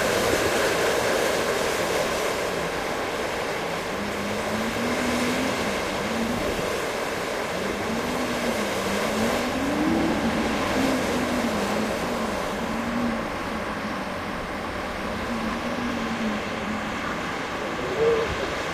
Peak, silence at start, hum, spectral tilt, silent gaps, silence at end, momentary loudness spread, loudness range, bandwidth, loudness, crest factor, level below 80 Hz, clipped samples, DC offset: -8 dBFS; 0 s; none; -4 dB/octave; none; 0 s; 6 LU; 4 LU; 15.5 kHz; -26 LUFS; 18 dB; -44 dBFS; under 0.1%; under 0.1%